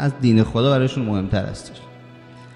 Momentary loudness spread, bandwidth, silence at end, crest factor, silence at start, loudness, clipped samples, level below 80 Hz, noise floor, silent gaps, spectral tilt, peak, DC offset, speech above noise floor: 20 LU; 11 kHz; 0 s; 18 dB; 0 s; -19 LUFS; under 0.1%; -42 dBFS; -42 dBFS; none; -7.5 dB/octave; -2 dBFS; under 0.1%; 23 dB